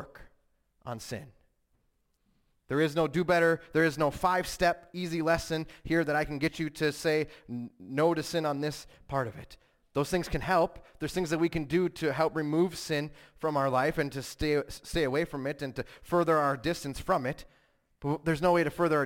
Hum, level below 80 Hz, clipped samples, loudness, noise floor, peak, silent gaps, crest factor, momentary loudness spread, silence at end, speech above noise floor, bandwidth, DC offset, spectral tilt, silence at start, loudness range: none; -52 dBFS; under 0.1%; -30 LUFS; -74 dBFS; -14 dBFS; none; 16 dB; 12 LU; 0 s; 44 dB; 17 kHz; under 0.1%; -5.5 dB/octave; 0 s; 4 LU